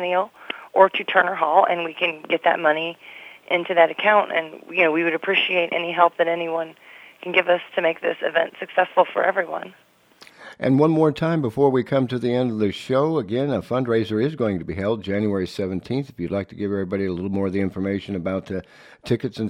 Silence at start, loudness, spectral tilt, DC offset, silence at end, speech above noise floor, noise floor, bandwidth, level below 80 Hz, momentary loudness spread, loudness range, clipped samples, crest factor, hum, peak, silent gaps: 0 s; -21 LUFS; -7 dB/octave; under 0.1%; 0 s; 30 dB; -51 dBFS; 14 kHz; -58 dBFS; 10 LU; 5 LU; under 0.1%; 22 dB; none; 0 dBFS; none